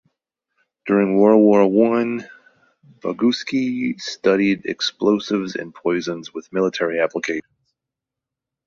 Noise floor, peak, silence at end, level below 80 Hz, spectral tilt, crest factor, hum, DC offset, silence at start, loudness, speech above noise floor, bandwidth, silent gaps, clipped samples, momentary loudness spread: -85 dBFS; -2 dBFS; 1.25 s; -64 dBFS; -5.5 dB/octave; 18 dB; none; under 0.1%; 0.85 s; -19 LUFS; 67 dB; 7.6 kHz; none; under 0.1%; 14 LU